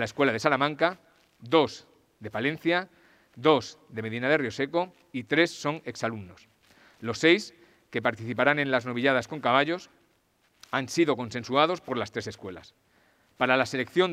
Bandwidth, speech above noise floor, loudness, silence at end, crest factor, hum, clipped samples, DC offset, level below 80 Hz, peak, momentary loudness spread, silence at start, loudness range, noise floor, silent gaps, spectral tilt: 15 kHz; 41 dB; -27 LUFS; 0 s; 24 dB; none; under 0.1%; under 0.1%; -72 dBFS; -4 dBFS; 15 LU; 0 s; 3 LU; -68 dBFS; none; -5 dB/octave